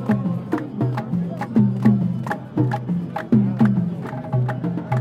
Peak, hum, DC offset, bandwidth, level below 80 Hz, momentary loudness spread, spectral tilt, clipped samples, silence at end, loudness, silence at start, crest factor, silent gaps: -4 dBFS; none; under 0.1%; 6.6 kHz; -56 dBFS; 8 LU; -9.5 dB/octave; under 0.1%; 0 s; -22 LUFS; 0 s; 16 dB; none